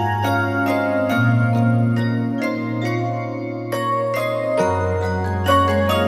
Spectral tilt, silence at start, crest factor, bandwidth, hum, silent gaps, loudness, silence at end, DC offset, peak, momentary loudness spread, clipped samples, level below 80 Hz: -7 dB/octave; 0 s; 16 dB; 15.5 kHz; none; none; -20 LUFS; 0 s; under 0.1%; -2 dBFS; 6 LU; under 0.1%; -50 dBFS